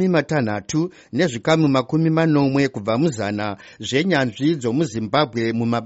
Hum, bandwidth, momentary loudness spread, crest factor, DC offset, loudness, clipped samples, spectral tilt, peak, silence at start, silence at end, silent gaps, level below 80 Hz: none; 8 kHz; 7 LU; 16 dB; under 0.1%; -20 LUFS; under 0.1%; -5.5 dB/octave; -4 dBFS; 0 s; 0 s; none; -56 dBFS